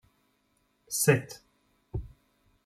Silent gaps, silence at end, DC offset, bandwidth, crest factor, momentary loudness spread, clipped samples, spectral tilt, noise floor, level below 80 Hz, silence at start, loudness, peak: none; 0.55 s; under 0.1%; 15.5 kHz; 24 dB; 21 LU; under 0.1%; -4.5 dB/octave; -72 dBFS; -52 dBFS; 0.9 s; -28 LUFS; -8 dBFS